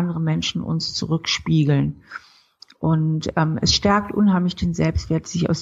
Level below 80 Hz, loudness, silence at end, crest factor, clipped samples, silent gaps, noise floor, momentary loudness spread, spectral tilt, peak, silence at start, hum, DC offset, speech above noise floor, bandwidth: -40 dBFS; -21 LUFS; 0 s; 16 dB; under 0.1%; none; -51 dBFS; 7 LU; -5.5 dB/octave; -4 dBFS; 0 s; none; under 0.1%; 31 dB; 7.8 kHz